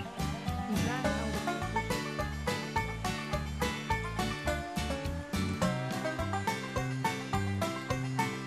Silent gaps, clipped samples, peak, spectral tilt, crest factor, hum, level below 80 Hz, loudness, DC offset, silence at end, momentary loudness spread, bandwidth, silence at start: none; under 0.1%; -18 dBFS; -5 dB/octave; 16 dB; none; -44 dBFS; -34 LUFS; under 0.1%; 0 s; 3 LU; 14 kHz; 0 s